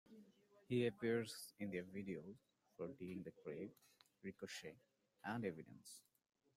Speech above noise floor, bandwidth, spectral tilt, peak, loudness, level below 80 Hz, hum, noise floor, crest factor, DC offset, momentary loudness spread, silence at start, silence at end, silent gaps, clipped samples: 23 dB; 16 kHz; -5.5 dB/octave; -28 dBFS; -48 LUFS; -84 dBFS; none; -71 dBFS; 20 dB; under 0.1%; 19 LU; 0.1 s; 0.55 s; none; under 0.1%